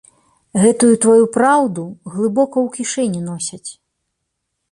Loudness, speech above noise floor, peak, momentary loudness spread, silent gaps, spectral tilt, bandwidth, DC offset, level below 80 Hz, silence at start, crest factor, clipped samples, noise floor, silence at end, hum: -15 LUFS; 59 dB; -2 dBFS; 15 LU; none; -5 dB/octave; 11.5 kHz; under 0.1%; -60 dBFS; 0.55 s; 16 dB; under 0.1%; -74 dBFS; 1 s; none